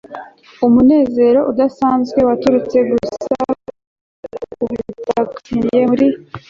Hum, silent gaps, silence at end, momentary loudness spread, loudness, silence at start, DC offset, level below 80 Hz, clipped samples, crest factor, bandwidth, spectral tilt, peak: none; 3.87-4.23 s; 0.1 s; 13 LU; -15 LUFS; 0.1 s; under 0.1%; -46 dBFS; under 0.1%; 12 dB; 7.4 kHz; -7.5 dB/octave; -2 dBFS